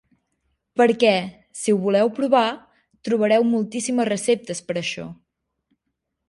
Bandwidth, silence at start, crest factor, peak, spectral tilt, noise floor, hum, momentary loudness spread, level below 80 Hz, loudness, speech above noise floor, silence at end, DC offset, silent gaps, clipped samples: 11.5 kHz; 0.75 s; 18 dB; -4 dBFS; -4.5 dB/octave; -78 dBFS; none; 14 LU; -66 dBFS; -21 LUFS; 58 dB; 1.15 s; under 0.1%; none; under 0.1%